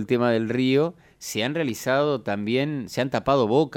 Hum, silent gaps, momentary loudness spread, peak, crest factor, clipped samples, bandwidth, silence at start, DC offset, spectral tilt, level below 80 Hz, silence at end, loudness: none; none; 6 LU; -6 dBFS; 16 dB; under 0.1%; 17.5 kHz; 0 s; under 0.1%; -5.5 dB/octave; -58 dBFS; 0 s; -24 LUFS